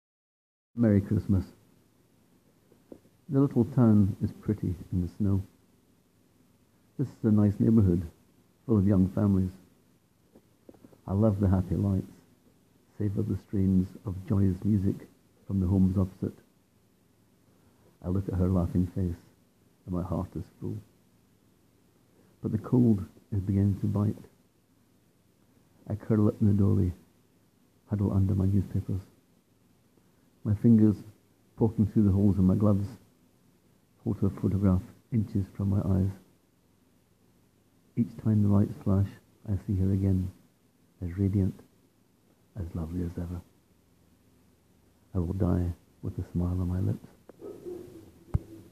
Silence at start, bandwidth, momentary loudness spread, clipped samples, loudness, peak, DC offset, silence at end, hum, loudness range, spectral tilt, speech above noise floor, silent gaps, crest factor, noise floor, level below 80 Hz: 0.75 s; 6.2 kHz; 15 LU; under 0.1%; -28 LUFS; -10 dBFS; under 0.1%; 0.1 s; none; 8 LU; -10.5 dB/octave; 40 dB; none; 18 dB; -66 dBFS; -56 dBFS